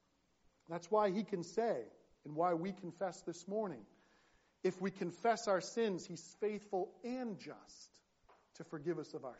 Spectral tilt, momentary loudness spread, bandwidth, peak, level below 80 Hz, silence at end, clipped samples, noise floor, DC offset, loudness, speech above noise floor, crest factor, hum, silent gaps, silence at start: -5 dB/octave; 16 LU; 8 kHz; -20 dBFS; -82 dBFS; 0 s; under 0.1%; -75 dBFS; under 0.1%; -40 LUFS; 35 dB; 20 dB; none; none; 0.7 s